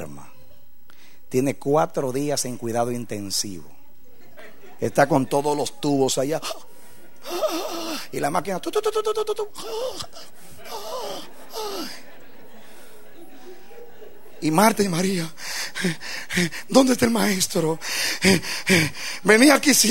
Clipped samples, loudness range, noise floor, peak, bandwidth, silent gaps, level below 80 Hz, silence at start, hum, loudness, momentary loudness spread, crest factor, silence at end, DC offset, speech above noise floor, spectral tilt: under 0.1%; 14 LU; -54 dBFS; -2 dBFS; 16 kHz; none; -58 dBFS; 0 s; none; -22 LUFS; 15 LU; 22 dB; 0 s; 2%; 33 dB; -3.5 dB/octave